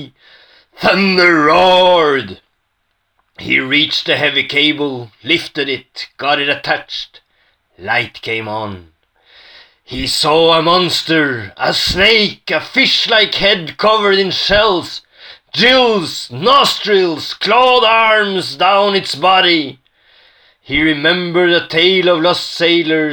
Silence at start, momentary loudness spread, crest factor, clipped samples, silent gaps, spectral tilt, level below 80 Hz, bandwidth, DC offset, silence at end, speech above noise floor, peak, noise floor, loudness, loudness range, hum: 0 s; 12 LU; 14 dB; under 0.1%; none; -4 dB/octave; -44 dBFS; 18 kHz; under 0.1%; 0 s; 53 dB; 0 dBFS; -66 dBFS; -12 LUFS; 7 LU; none